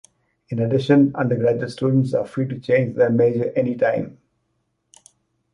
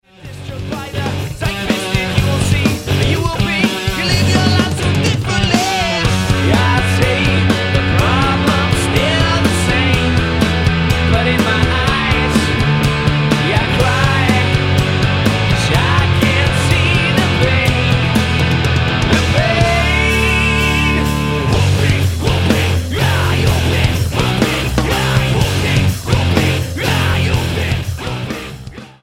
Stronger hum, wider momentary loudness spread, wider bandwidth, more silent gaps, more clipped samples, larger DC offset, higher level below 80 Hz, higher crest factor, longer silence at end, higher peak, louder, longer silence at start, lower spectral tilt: neither; first, 9 LU vs 5 LU; second, 11 kHz vs 16.5 kHz; neither; neither; neither; second, -60 dBFS vs -26 dBFS; about the same, 16 dB vs 14 dB; first, 1.4 s vs 0.1 s; second, -4 dBFS vs 0 dBFS; second, -20 LUFS vs -14 LUFS; first, 0.5 s vs 0.2 s; first, -8.5 dB/octave vs -5 dB/octave